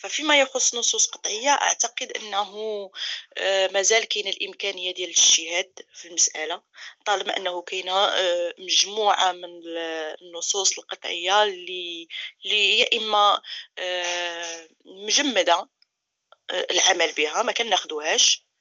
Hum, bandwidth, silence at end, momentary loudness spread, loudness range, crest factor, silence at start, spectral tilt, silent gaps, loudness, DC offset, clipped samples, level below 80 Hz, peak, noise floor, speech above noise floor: none; 8.4 kHz; 0.25 s; 14 LU; 3 LU; 18 dB; 0 s; 1.5 dB/octave; none; -22 LUFS; under 0.1%; under 0.1%; under -90 dBFS; -6 dBFS; -68 dBFS; 44 dB